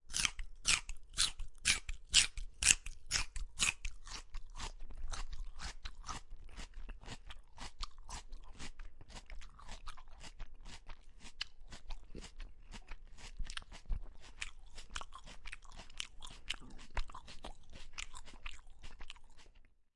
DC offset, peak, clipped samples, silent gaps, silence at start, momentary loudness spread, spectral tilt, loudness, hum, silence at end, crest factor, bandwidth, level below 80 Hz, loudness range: under 0.1%; -6 dBFS; under 0.1%; none; 0.05 s; 23 LU; 0.5 dB/octave; -38 LUFS; none; 0.15 s; 36 dB; 11.5 kHz; -48 dBFS; 19 LU